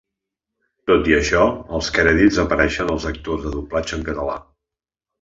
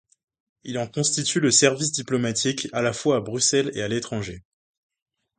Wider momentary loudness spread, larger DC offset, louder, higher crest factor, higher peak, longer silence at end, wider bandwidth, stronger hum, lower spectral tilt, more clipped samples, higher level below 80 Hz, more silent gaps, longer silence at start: about the same, 11 LU vs 13 LU; neither; first, -19 LUFS vs -22 LUFS; about the same, 18 dB vs 22 dB; about the same, -2 dBFS vs -2 dBFS; second, 0.8 s vs 1 s; second, 7.8 kHz vs 9.6 kHz; neither; first, -5 dB/octave vs -3 dB/octave; neither; first, -34 dBFS vs -58 dBFS; neither; first, 0.85 s vs 0.65 s